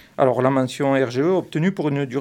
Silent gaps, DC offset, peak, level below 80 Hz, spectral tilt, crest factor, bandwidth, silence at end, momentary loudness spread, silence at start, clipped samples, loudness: none; under 0.1%; -4 dBFS; -64 dBFS; -7 dB/octave; 16 dB; 14 kHz; 0 s; 4 LU; 0.2 s; under 0.1%; -20 LUFS